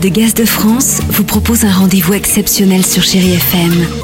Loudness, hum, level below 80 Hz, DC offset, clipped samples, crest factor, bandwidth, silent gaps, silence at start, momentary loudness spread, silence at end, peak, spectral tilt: -9 LUFS; none; -30 dBFS; under 0.1%; under 0.1%; 10 dB; 16.5 kHz; none; 0 s; 2 LU; 0 s; 0 dBFS; -4 dB/octave